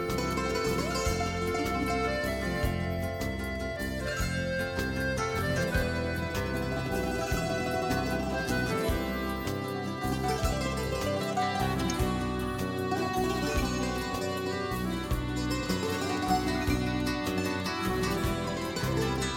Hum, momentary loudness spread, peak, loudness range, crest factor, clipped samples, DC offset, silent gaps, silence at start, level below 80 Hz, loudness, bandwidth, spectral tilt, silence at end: none; 3 LU; -16 dBFS; 1 LU; 16 dB; under 0.1%; under 0.1%; none; 0 s; -40 dBFS; -31 LUFS; 18.5 kHz; -5 dB/octave; 0 s